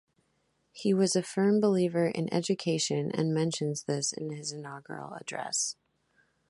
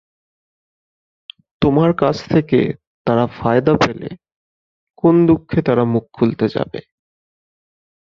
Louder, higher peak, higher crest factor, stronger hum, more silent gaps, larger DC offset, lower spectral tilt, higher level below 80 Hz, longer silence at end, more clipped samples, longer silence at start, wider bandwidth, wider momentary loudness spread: second, -30 LUFS vs -16 LUFS; second, -14 dBFS vs 0 dBFS; about the same, 16 dB vs 18 dB; neither; second, none vs 2.87-3.05 s, 4.36-4.87 s; neither; second, -4.5 dB/octave vs -8 dB/octave; second, -74 dBFS vs -46 dBFS; second, 0.75 s vs 1.3 s; neither; second, 0.75 s vs 1.6 s; first, 11.5 kHz vs 7.2 kHz; first, 14 LU vs 11 LU